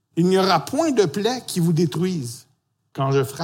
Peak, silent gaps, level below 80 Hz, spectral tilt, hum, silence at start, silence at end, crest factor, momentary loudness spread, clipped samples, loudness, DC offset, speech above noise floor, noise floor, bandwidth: -6 dBFS; none; -66 dBFS; -6 dB/octave; none; 0.15 s; 0 s; 16 dB; 12 LU; under 0.1%; -21 LUFS; under 0.1%; 46 dB; -66 dBFS; 17 kHz